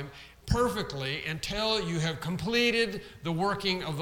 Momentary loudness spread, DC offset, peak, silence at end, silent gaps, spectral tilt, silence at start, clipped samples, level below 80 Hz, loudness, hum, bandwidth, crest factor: 8 LU; under 0.1%; -12 dBFS; 0 s; none; -4.5 dB/octave; 0 s; under 0.1%; -46 dBFS; -29 LUFS; none; 18 kHz; 20 dB